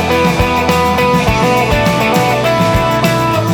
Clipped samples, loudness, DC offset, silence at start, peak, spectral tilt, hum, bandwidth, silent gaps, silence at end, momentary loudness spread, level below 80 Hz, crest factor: under 0.1%; -12 LUFS; under 0.1%; 0 s; 0 dBFS; -5.5 dB/octave; none; over 20 kHz; none; 0 s; 1 LU; -26 dBFS; 12 dB